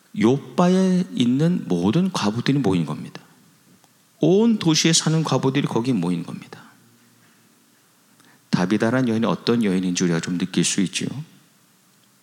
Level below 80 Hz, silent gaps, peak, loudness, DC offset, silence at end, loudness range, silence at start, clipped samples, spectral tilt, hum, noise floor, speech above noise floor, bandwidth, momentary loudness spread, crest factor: -68 dBFS; none; -2 dBFS; -20 LUFS; under 0.1%; 1 s; 6 LU; 0.15 s; under 0.1%; -5 dB/octave; none; -57 dBFS; 37 dB; 15 kHz; 9 LU; 20 dB